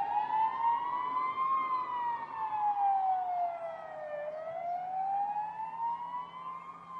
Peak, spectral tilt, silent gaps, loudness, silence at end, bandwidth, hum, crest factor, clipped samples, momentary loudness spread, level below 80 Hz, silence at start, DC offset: -22 dBFS; -5.5 dB/octave; none; -34 LUFS; 0 s; 6 kHz; none; 12 dB; under 0.1%; 11 LU; -80 dBFS; 0 s; under 0.1%